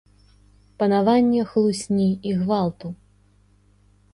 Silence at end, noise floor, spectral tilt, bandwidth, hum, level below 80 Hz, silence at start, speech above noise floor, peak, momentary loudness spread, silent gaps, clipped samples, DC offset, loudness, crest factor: 1.2 s; -57 dBFS; -7 dB/octave; 11.5 kHz; 50 Hz at -40 dBFS; -56 dBFS; 0.8 s; 37 dB; -6 dBFS; 15 LU; none; under 0.1%; under 0.1%; -21 LUFS; 18 dB